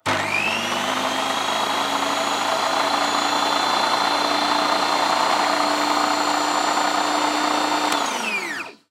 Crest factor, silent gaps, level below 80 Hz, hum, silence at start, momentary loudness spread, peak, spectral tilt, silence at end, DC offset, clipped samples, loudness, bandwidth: 16 dB; none; -70 dBFS; none; 0.05 s; 3 LU; -6 dBFS; -1.5 dB/octave; 0.2 s; under 0.1%; under 0.1%; -20 LUFS; 16 kHz